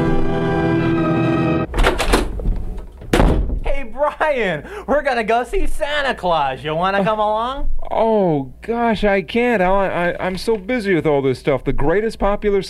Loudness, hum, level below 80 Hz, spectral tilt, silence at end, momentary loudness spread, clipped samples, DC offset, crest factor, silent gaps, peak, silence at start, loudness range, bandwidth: -18 LUFS; none; -24 dBFS; -6 dB/octave; 0 s; 8 LU; under 0.1%; under 0.1%; 16 dB; none; 0 dBFS; 0 s; 2 LU; 13.5 kHz